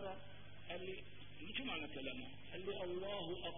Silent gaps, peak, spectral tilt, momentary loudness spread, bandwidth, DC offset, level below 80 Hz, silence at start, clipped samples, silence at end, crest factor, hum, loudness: none; -28 dBFS; -2.5 dB/octave; 11 LU; 3.7 kHz; 0.3%; -68 dBFS; 0 s; under 0.1%; 0 s; 18 dB; 50 Hz at -65 dBFS; -47 LUFS